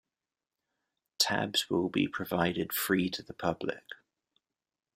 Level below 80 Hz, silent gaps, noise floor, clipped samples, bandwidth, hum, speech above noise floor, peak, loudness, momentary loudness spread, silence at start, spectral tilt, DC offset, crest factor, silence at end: -68 dBFS; none; under -90 dBFS; under 0.1%; 16 kHz; none; over 58 dB; -12 dBFS; -31 LUFS; 10 LU; 1.2 s; -3.5 dB/octave; under 0.1%; 22 dB; 1 s